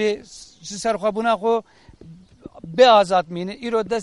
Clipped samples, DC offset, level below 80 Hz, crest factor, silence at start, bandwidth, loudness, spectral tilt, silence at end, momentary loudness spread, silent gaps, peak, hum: under 0.1%; under 0.1%; -56 dBFS; 20 dB; 0 s; 11.5 kHz; -19 LUFS; -4 dB/octave; 0 s; 21 LU; none; -2 dBFS; none